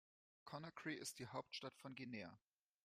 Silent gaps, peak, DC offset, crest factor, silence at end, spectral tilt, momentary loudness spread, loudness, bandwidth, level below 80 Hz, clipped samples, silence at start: none; -34 dBFS; under 0.1%; 20 dB; 0.45 s; -3.5 dB/octave; 8 LU; -52 LUFS; 15.5 kHz; -88 dBFS; under 0.1%; 0.45 s